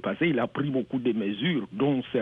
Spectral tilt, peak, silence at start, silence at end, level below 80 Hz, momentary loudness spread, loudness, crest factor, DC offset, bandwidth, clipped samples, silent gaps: -9 dB/octave; -14 dBFS; 0.05 s; 0 s; -66 dBFS; 3 LU; -27 LUFS; 12 dB; under 0.1%; 4 kHz; under 0.1%; none